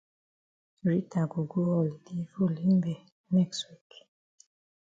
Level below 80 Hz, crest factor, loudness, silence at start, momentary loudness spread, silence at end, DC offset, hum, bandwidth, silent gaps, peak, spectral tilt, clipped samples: -70 dBFS; 16 dB; -30 LUFS; 0.85 s; 12 LU; 1.1 s; under 0.1%; none; 7.8 kHz; 3.12-3.24 s; -16 dBFS; -7.5 dB/octave; under 0.1%